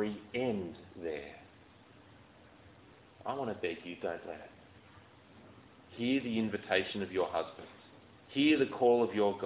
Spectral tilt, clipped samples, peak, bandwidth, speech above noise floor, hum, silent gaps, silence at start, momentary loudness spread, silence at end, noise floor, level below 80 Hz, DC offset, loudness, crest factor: -3.5 dB/octave; under 0.1%; -16 dBFS; 4 kHz; 26 dB; none; none; 0 s; 20 LU; 0 s; -59 dBFS; -68 dBFS; under 0.1%; -34 LUFS; 20 dB